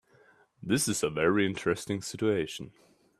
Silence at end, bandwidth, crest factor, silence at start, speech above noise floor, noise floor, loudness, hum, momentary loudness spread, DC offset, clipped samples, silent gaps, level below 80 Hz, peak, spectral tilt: 0.5 s; 15 kHz; 18 dB; 0.6 s; 33 dB; -62 dBFS; -29 LUFS; none; 14 LU; under 0.1%; under 0.1%; none; -62 dBFS; -12 dBFS; -4.5 dB/octave